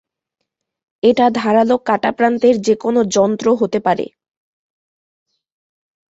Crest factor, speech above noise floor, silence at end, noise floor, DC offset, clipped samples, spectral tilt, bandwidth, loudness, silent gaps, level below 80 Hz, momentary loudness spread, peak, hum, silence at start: 16 dB; 63 dB; 2.05 s; -77 dBFS; under 0.1%; under 0.1%; -5 dB/octave; 8 kHz; -15 LUFS; none; -60 dBFS; 4 LU; -2 dBFS; none; 1.05 s